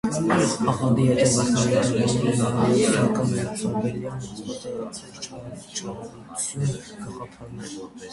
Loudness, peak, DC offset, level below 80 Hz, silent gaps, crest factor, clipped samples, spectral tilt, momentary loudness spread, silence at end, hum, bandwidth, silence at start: -23 LUFS; -6 dBFS; under 0.1%; -52 dBFS; none; 18 dB; under 0.1%; -5.5 dB/octave; 17 LU; 0 s; none; 11.5 kHz; 0.05 s